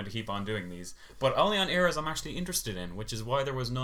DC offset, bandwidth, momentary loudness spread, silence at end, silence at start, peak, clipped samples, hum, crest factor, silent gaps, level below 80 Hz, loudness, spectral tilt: under 0.1%; 18.5 kHz; 12 LU; 0 s; 0 s; -10 dBFS; under 0.1%; none; 20 dB; none; -50 dBFS; -30 LUFS; -4 dB/octave